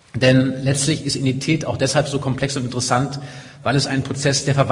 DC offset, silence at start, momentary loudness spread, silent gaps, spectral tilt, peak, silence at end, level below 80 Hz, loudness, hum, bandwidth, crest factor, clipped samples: under 0.1%; 0.15 s; 6 LU; none; -4.5 dB/octave; 0 dBFS; 0 s; -48 dBFS; -19 LUFS; none; 11 kHz; 18 dB; under 0.1%